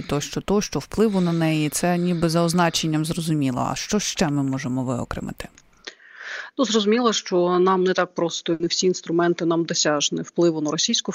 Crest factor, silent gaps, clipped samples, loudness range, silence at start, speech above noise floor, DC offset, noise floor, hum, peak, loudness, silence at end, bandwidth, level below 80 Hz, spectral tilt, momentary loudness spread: 18 dB; none; under 0.1%; 4 LU; 0 s; 22 dB; under 0.1%; -43 dBFS; none; -4 dBFS; -22 LUFS; 0 s; 16 kHz; -50 dBFS; -4.5 dB/octave; 12 LU